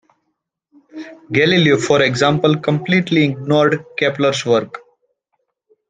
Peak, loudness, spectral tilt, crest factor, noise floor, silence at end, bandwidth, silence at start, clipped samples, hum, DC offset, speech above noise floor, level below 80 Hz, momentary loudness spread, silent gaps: -2 dBFS; -15 LUFS; -5.5 dB/octave; 16 dB; -73 dBFS; 1.1 s; 9.6 kHz; 0.95 s; under 0.1%; none; under 0.1%; 58 dB; -56 dBFS; 19 LU; none